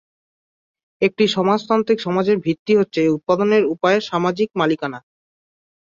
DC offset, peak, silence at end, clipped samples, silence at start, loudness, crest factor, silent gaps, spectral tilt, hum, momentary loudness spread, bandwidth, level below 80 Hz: under 0.1%; -2 dBFS; 0.85 s; under 0.1%; 1 s; -18 LUFS; 16 dB; 2.59-2.66 s; -6 dB/octave; none; 5 LU; 7.6 kHz; -62 dBFS